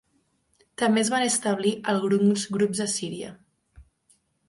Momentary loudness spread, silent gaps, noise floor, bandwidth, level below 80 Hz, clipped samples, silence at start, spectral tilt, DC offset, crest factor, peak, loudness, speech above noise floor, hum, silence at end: 13 LU; none; -69 dBFS; 11.5 kHz; -62 dBFS; under 0.1%; 0.8 s; -4 dB/octave; under 0.1%; 16 dB; -10 dBFS; -24 LUFS; 45 dB; none; 0.65 s